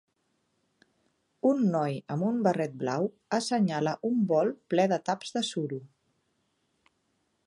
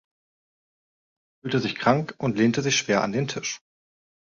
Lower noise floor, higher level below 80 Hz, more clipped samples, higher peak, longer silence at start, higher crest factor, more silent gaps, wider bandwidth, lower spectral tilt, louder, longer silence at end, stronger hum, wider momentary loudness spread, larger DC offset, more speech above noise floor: second, -75 dBFS vs under -90 dBFS; second, -78 dBFS vs -62 dBFS; neither; second, -10 dBFS vs -4 dBFS; about the same, 1.45 s vs 1.45 s; about the same, 20 dB vs 22 dB; neither; first, 11.5 kHz vs 7.6 kHz; first, -6 dB/octave vs -4.5 dB/octave; second, -29 LUFS vs -24 LUFS; first, 1.6 s vs 0.75 s; neither; second, 6 LU vs 10 LU; neither; second, 47 dB vs over 66 dB